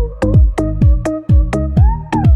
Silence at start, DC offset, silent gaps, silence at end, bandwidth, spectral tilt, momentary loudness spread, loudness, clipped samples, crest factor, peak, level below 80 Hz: 0 s; under 0.1%; none; 0 s; 9.8 kHz; -9 dB/octave; 3 LU; -14 LUFS; under 0.1%; 10 dB; 0 dBFS; -14 dBFS